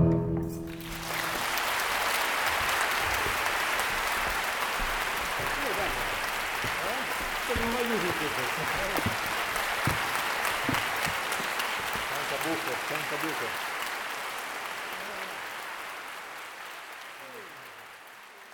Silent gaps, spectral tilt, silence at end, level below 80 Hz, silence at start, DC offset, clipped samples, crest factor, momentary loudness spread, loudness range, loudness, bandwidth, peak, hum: none; -3 dB/octave; 0 s; -48 dBFS; 0 s; under 0.1%; under 0.1%; 22 dB; 13 LU; 9 LU; -29 LUFS; 19.5 kHz; -10 dBFS; none